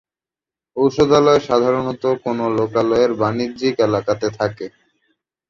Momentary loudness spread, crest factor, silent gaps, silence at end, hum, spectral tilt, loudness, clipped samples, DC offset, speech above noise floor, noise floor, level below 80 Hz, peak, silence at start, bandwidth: 9 LU; 16 dB; none; 0.8 s; none; -6.5 dB/octave; -17 LUFS; under 0.1%; under 0.1%; 73 dB; -90 dBFS; -52 dBFS; -2 dBFS; 0.75 s; 7.4 kHz